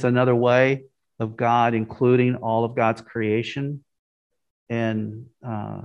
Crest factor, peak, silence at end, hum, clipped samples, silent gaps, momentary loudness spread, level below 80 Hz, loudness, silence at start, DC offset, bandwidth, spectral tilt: 18 dB; -4 dBFS; 0 s; none; under 0.1%; 3.99-4.30 s, 4.50-4.66 s; 14 LU; -64 dBFS; -22 LUFS; 0 s; under 0.1%; 8 kHz; -8 dB/octave